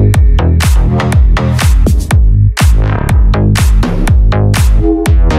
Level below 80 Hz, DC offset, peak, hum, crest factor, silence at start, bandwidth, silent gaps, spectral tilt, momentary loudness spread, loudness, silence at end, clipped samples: -10 dBFS; under 0.1%; 0 dBFS; none; 8 dB; 0 s; 15 kHz; none; -6 dB/octave; 2 LU; -10 LUFS; 0 s; under 0.1%